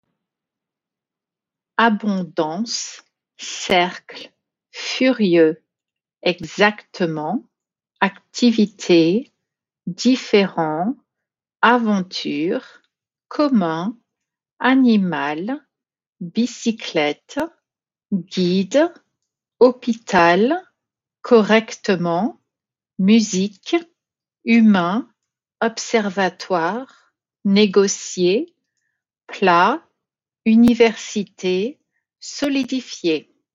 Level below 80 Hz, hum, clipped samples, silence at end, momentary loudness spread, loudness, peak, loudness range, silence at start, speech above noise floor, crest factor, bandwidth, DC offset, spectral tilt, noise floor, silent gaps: -62 dBFS; none; under 0.1%; 0.35 s; 14 LU; -19 LUFS; -2 dBFS; 4 LU; 1.8 s; 71 dB; 18 dB; 7.6 kHz; under 0.1%; -4 dB/octave; -88 dBFS; 16.09-16.13 s